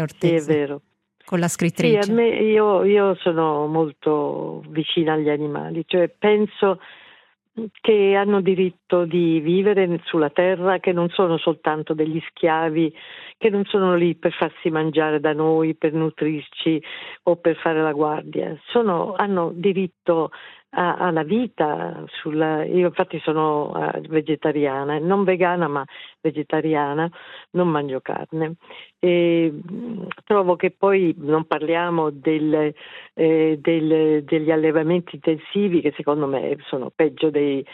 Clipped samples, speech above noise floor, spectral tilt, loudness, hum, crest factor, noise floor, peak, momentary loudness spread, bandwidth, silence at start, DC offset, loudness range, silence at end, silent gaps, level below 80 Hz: under 0.1%; 33 dB; -6.5 dB/octave; -21 LUFS; none; 18 dB; -53 dBFS; -2 dBFS; 10 LU; 13 kHz; 0 s; under 0.1%; 3 LU; 0 s; none; -72 dBFS